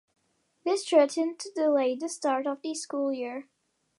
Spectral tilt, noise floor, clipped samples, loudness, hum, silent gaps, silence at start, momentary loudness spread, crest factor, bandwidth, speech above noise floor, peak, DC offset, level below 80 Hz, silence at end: -2 dB/octave; -66 dBFS; under 0.1%; -28 LUFS; none; none; 0.65 s; 11 LU; 20 dB; 11.5 kHz; 39 dB; -10 dBFS; under 0.1%; -88 dBFS; 0.55 s